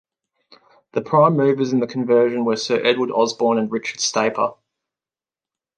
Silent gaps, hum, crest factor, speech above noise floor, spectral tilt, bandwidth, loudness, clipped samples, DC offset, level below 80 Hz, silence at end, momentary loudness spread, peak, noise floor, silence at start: none; none; 18 dB; over 72 dB; -4.5 dB/octave; 9.2 kHz; -19 LUFS; under 0.1%; under 0.1%; -72 dBFS; 1.25 s; 8 LU; -2 dBFS; under -90 dBFS; 0.95 s